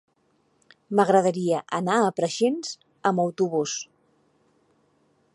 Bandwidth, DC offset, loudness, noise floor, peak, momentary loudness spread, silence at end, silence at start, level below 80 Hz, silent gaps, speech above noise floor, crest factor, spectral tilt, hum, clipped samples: 11.5 kHz; under 0.1%; -24 LUFS; -67 dBFS; -6 dBFS; 11 LU; 1.5 s; 0.9 s; -76 dBFS; none; 44 dB; 20 dB; -5 dB/octave; none; under 0.1%